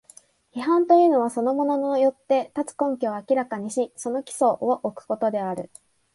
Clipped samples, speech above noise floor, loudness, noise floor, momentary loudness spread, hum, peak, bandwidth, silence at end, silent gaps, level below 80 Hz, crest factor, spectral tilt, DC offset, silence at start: under 0.1%; 31 dB; -23 LUFS; -53 dBFS; 12 LU; none; -6 dBFS; 11.5 kHz; 0.5 s; none; -72 dBFS; 18 dB; -5.5 dB/octave; under 0.1%; 0.55 s